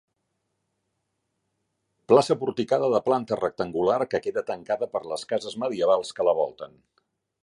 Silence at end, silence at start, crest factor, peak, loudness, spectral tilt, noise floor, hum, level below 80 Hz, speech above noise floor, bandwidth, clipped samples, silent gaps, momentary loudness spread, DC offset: 0.8 s; 2.1 s; 22 dB; -4 dBFS; -25 LUFS; -5.5 dB/octave; -78 dBFS; none; -66 dBFS; 53 dB; 11.5 kHz; under 0.1%; none; 10 LU; under 0.1%